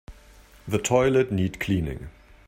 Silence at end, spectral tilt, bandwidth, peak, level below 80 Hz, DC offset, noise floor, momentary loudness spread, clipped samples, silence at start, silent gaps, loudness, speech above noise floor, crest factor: 0.4 s; -5.5 dB/octave; 16 kHz; -6 dBFS; -46 dBFS; under 0.1%; -51 dBFS; 20 LU; under 0.1%; 0.1 s; none; -24 LUFS; 28 dB; 20 dB